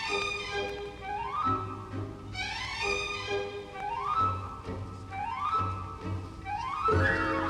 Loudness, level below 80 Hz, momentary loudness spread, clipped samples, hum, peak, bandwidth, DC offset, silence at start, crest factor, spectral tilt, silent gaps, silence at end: -32 LUFS; -50 dBFS; 12 LU; under 0.1%; none; -16 dBFS; 12 kHz; under 0.1%; 0 s; 16 dB; -5 dB/octave; none; 0 s